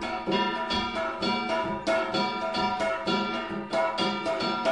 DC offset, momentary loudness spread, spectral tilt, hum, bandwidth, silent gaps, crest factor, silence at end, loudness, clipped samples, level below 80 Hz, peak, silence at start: 0.1%; 2 LU; -4.5 dB/octave; none; 11.5 kHz; none; 14 dB; 0 s; -28 LUFS; under 0.1%; -56 dBFS; -14 dBFS; 0 s